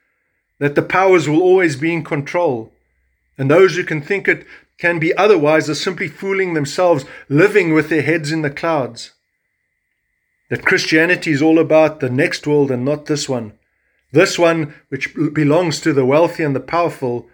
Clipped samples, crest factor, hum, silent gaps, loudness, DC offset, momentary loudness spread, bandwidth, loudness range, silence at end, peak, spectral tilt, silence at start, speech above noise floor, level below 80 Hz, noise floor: under 0.1%; 16 dB; none; none; -16 LUFS; under 0.1%; 9 LU; 18.5 kHz; 3 LU; 0.15 s; 0 dBFS; -5.5 dB/octave; 0.6 s; 55 dB; -58 dBFS; -70 dBFS